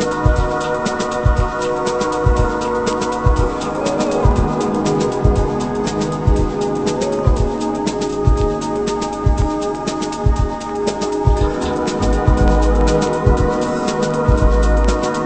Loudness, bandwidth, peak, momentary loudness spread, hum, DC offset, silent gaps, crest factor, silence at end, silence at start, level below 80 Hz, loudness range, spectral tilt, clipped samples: -18 LUFS; 8.8 kHz; 0 dBFS; 5 LU; none; under 0.1%; none; 16 dB; 0 s; 0 s; -20 dBFS; 3 LU; -6.5 dB/octave; under 0.1%